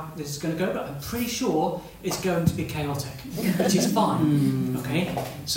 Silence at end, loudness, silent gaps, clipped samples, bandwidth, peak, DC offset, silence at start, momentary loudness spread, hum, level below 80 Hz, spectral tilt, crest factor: 0 s; -26 LUFS; none; under 0.1%; 16.5 kHz; -8 dBFS; under 0.1%; 0 s; 10 LU; none; -50 dBFS; -5.5 dB/octave; 18 dB